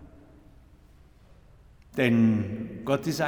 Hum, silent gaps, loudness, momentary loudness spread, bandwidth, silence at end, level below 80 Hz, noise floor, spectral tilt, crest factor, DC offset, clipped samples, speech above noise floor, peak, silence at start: none; none; -26 LUFS; 13 LU; 17.5 kHz; 0 s; -56 dBFS; -55 dBFS; -6.5 dB/octave; 20 dB; under 0.1%; under 0.1%; 31 dB; -8 dBFS; 0 s